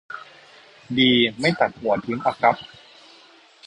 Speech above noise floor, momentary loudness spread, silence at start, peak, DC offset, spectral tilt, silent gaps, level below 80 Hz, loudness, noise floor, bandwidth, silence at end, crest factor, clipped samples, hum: 31 dB; 20 LU; 0.1 s; -4 dBFS; under 0.1%; -5.5 dB/octave; none; -60 dBFS; -20 LUFS; -51 dBFS; 10 kHz; 1 s; 20 dB; under 0.1%; none